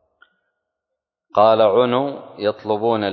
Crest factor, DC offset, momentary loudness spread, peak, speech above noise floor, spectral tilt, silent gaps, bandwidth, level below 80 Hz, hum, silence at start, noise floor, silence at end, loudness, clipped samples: 18 dB; under 0.1%; 11 LU; -2 dBFS; 65 dB; -8.5 dB/octave; none; 5.4 kHz; -62 dBFS; none; 1.35 s; -82 dBFS; 0 s; -18 LUFS; under 0.1%